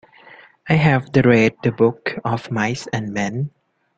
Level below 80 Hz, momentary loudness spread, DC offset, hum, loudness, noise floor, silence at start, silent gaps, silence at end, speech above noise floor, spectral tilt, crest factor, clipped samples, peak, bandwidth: -52 dBFS; 10 LU; under 0.1%; none; -19 LUFS; -46 dBFS; 0.65 s; none; 0.5 s; 28 dB; -7 dB/octave; 18 dB; under 0.1%; -2 dBFS; 8.4 kHz